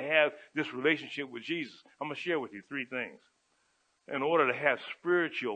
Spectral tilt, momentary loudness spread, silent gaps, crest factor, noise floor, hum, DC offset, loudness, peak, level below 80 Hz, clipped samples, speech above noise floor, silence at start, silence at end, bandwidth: -5.5 dB/octave; 12 LU; none; 22 dB; -74 dBFS; none; under 0.1%; -32 LUFS; -10 dBFS; -88 dBFS; under 0.1%; 42 dB; 0 s; 0 s; 9 kHz